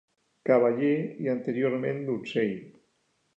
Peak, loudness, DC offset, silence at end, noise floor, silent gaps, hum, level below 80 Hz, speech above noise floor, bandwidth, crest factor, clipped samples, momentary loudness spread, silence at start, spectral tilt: -10 dBFS; -27 LUFS; under 0.1%; 0.65 s; -72 dBFS; none; none; -78 dBFS; 46 dB; 8 kHz; 18 dB; under 0.1%; 9 LU; 0.45 s; -8.5 dB/octave